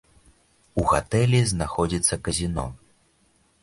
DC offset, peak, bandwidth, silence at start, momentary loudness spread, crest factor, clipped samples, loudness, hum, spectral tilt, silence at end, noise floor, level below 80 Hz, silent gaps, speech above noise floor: under 0.1%; -6 dBFS; 11.5 kHz; 0.75 s; 10 LU; 18 dB; under 0.1%; -23 LUFS; none; -5 dB/octave; 0.85 s; -63 dBFS; -40 dBFS; none; 41 dB